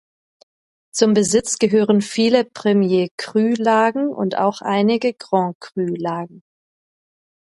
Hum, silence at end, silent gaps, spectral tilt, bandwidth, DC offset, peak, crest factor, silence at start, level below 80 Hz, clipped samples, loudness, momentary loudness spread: none; 1.1 s; 3.11-3.18 s, 5.55-5.61 s; -5 dB/octave; 11.5 kHz; under 0.1%; 0 dBFS; 18 dB; 0.95 s; -62 dBFS; under 0.1%; -18 LUFS; 9 LU